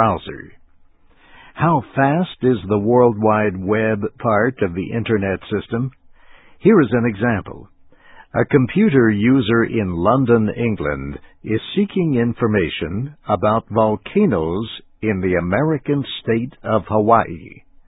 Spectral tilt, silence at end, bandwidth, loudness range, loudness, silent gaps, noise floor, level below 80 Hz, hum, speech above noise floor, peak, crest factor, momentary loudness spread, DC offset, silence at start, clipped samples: -12.5 dB/octave; 0.35 s; 4 kHz; 3 LU; -18 LUFS; none; -50 dBFS; -42 dBFS; none; 32 dB; 0 dBFS; 18 dB; 10 LU; under 0.1%; 0 s; under 0.1%